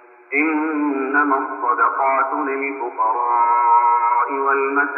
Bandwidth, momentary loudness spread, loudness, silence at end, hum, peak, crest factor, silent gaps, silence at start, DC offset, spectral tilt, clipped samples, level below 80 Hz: 3 kHz; 7 LU; -18 LUFS; 0 s; none; -4 dBFS; 14 dB; none; 0.3 s; under 0.1%; -8 dB/octave; under 0.1%; -82 dBFS